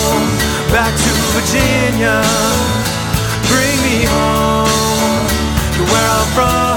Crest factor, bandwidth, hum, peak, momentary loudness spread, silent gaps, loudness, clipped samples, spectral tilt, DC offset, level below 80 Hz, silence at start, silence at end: 14 dB; 19.5 kHz; none; 0 dBFS; 3 LU; none; -13 LUFS; under 0.1%; -4 dB/octave; under 0.1%; -24 dBFS; 0 s; 0 s